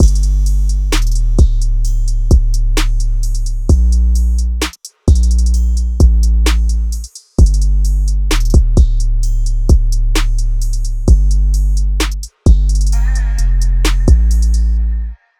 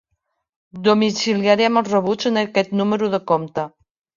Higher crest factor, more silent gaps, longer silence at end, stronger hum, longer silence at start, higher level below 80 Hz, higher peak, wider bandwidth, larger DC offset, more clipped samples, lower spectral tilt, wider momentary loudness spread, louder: second, 10 dB vs 18 dB; neither; second, 0.25 s vs 0.5 s; neither; second, 0 s vs 0.75 s; first, -10 dBFS vs -62 dBFS; about the same, 0 dBFS vs -2 dBFS; first, 13.5 kHz vs 7.4 kHz; neither; neither; about the same, -5.5 dB/octave vs -5 dB/octave; about the same, 7 LU vs 6 LU; first, -15 LUFS vs -19 LUFS